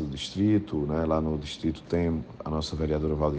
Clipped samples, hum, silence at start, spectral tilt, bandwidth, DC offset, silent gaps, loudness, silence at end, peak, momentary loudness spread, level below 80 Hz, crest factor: under 0.1%; none; 0 s; -7 dB/octave; 9.2 kHz; under 0.1%; none; -28 LUFS; 0 s; -12 dBFS; 7 LU; -40 dBFS; 16 dB